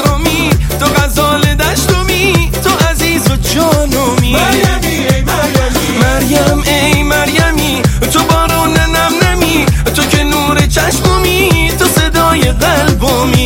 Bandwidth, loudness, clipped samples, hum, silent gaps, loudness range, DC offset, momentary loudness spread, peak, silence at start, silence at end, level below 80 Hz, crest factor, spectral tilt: 17.5 kHz; -10 LUFS; under 0.1%; none; none; 1 LU; under 0.1%; 2 LU; 0 dBFS; 0 s; 0 s; -18 dBFS; 10 dB; -4.5 dB/octave